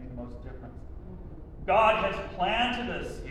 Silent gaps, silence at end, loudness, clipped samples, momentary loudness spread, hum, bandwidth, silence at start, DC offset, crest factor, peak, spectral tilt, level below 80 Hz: none; 0 s; -27 LUFS; under 0.1%; 22 LU; none; 12 kHz; 0 s; under 0.1%; 18 dB; -10 dBFS; -5.5 dB/octave; -44 dBFS